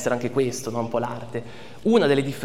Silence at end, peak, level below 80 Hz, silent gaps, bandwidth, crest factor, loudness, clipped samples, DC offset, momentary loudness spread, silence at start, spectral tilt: 0 s; -4 dBFS; -58 dBFS; none; 16 kHz; 18 dB; -24 LUFS; under 0.1%; 1%; 15 LU; 0 s; -5.5 dB/octave